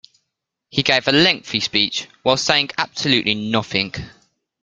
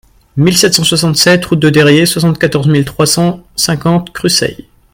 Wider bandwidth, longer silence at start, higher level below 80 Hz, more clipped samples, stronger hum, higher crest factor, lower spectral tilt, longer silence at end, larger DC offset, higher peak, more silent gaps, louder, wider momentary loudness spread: second, 9.4 kHz vs 17.5 kHz; first, 0.75 s vs 0.35 s; second, -52 dBFS vs -40 dBFS; second, under 0.1% vs 0.2%; neither; first, 20 dB vs 10 dB; about the same, -3.5 dB/octave vs -4 dB/octave; first, 0.55 s vs 0.4 s; neither; about the same, 0 dBFS vs 0 dBFS; neither; second, -18 LUFS vs -10 LUFS; about the same, 7 LU vs 6 LU